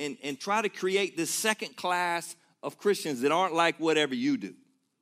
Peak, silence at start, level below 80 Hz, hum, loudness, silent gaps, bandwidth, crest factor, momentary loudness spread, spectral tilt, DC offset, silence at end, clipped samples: -10 dBFS; 0 s; -86 dBFS; none; -28 LUFS; none; 15.5 kHz; 20 dB; 10 LU; -3 dB/octave; under 0.1%; 0.5 s; under 0.1%